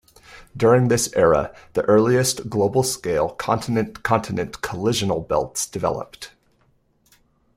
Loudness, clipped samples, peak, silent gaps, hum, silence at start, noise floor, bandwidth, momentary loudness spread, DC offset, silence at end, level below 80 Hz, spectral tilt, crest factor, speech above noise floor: -21 LUFS; under 0.1%; -4 dBFS; none; none; 0.3 s; -62 dBFS; 16 kHz; 11 LU; under 0.1%; 1.3 s; -48 dBFS; -5 dB/octave; 18 dB; 42 dB